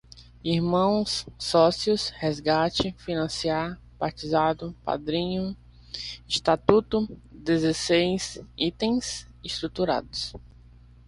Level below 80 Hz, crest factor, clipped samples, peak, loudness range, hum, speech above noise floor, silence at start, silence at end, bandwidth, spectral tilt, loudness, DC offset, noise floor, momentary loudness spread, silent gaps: -50 dBFS; 24 dB; under 0.1%; -2 dBFS; 4 LU; 60 Hz at -50 dBFS; 25 dB; 0.15 s; 0.6 s; 11.5 kHz; -5 dB/octave; -26 LUFS; under 0.1%; -51 dBFS; 13 LU; none